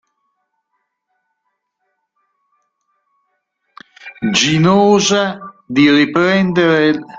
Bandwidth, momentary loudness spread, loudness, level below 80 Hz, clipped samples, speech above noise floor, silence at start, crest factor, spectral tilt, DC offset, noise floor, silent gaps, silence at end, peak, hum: 7.8 kHz; 12 LU; -13 LUFS; -54 dBFS; under 0.1%; 59 dB; 4.05 s; 16 dB; -4.5 dB/octave; under 0.1%; -71 dBFS; none; 0 s; 0 dBFS; none